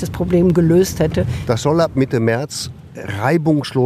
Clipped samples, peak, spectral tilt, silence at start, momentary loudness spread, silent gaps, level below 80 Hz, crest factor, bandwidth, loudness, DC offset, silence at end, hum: under 0.1%; -2 dBFS; -6.5 dB/octave; 0 s; 12 LU; none; -38 dBFS; 14 dB; 15 kHz; -16 LUFS; under 0.1%; 0 s; none